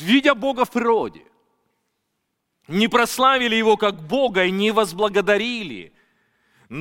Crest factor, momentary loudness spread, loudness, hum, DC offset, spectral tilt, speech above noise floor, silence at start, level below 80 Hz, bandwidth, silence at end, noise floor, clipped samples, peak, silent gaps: 18 dB; 11 LU; -19 LUFS; none; under 0.1%; -4 dB/octave; 56 dB; 0 s; -58 dBFS; 17 kHz; 0 s; -75 dBFS; under 0.1%; -2 dBFS; none